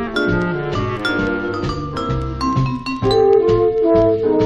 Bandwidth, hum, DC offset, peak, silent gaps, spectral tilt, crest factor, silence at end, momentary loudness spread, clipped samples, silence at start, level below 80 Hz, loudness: 9.4 kHz; none; under 0.1%; -4 dBFS; none; -7 dB/octave; 14 dB; 0 s; 9 LU; under 0.1%; 0 s; -34 dBFS; -17 LUFS